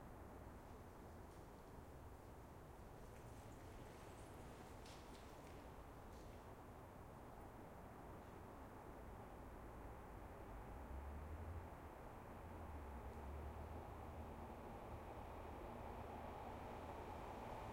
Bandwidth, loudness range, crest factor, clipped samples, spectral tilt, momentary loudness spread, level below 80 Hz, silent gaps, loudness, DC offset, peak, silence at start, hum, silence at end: 16 kHz; 5 LU; 16 dB; under 0.1%; -6.5 dB/octave; 6 LU; -62 dBFS; none; -57 LUFS; under 0.1%; -40 dBFS; 0 s; none; 0 s